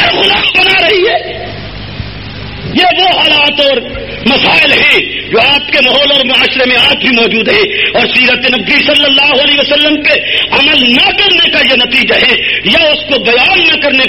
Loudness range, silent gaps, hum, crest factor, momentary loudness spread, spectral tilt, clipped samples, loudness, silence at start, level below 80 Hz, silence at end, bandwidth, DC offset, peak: 3 LU; none; none; 8 dB; 10 LU; -4 dB/octave; 0.4%; -6 LUFS; 0 s; -36 dBFS; 0 s; over 20 kHz; 0.6%; 0 dBFS